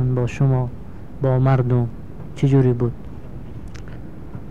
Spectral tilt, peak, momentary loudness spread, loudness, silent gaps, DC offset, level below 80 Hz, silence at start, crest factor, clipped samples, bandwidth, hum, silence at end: -9.5 dB/octave; -6 dBFS; 20 LU; -20 LUFS; none; 2%; -40 dBFS; 0 s; 16 dB; under 0.1%; 7.2 kHz; none; 0 s